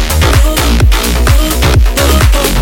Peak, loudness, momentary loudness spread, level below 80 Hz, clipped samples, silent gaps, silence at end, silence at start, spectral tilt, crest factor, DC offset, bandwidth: 0 dBFS; -9 LUFS; 1 LU; -10 dBFS; under 0.1%; none; 0 s; 0 s; -4.5 dB/octave; 8 dB; under 0.1%; 17.5 kHz